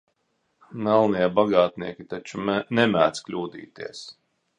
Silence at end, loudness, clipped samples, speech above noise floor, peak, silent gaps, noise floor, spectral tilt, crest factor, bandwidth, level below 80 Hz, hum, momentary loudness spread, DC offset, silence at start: 0.45 s; -23 LUFS; under 0.1%; 49 dB; -4 dBFS; none; -72 dBFS; -5.5 dB/octave; 22 dB; 10 kHz; -62 dBFS; none; 18 LU; under 0.1%; 0.7 s